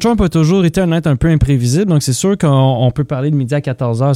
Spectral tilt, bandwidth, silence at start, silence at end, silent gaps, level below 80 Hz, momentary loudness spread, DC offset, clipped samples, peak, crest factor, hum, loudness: -6.5 dB/octave; 14 kHz; 0 s; 0 s; none; -30 dBFS; 5 LU; under 0.1%; under 0.1%; 0 dBFS; 12 dB; none; -13 LUFS